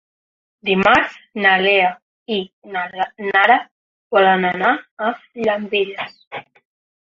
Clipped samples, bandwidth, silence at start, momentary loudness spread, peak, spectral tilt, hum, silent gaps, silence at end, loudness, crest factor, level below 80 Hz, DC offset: under 0.1%; 7.4 kHz; 0.65 s; 14 LU; 0 dBFS; -5.5 dB/octave; none; 2.02-2.26 s, 2.53-2.62 s, 3.71-4.10 s, 4.91-4.97 s, 6.27-6.31 s; 0.65 s; -17 LUFS; 18 dB; -58 dBFS; under 0.1%